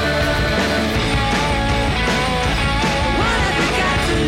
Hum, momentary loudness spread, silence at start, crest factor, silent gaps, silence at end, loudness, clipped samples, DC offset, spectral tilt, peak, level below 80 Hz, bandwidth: none; 1 LU; 0 s; 10 dB; none; 0 s; -17 LUFS; under 0.1%; under 0.1%; -4.5 dB/octave; -8 dBFS; -26 dBFS; 16.5 kHz